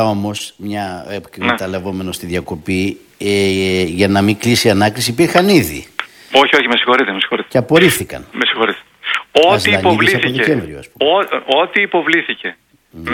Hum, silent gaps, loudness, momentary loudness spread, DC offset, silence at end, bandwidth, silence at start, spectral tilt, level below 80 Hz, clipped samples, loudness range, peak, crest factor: none; none; -14 LUFS; 13 LU; under 0.1%; 0 s; 19 kHz; 0 s; -4.5 dB/octave; -48 dBFS; 0.2%; 5 LU; 0 dBFS; 14 dB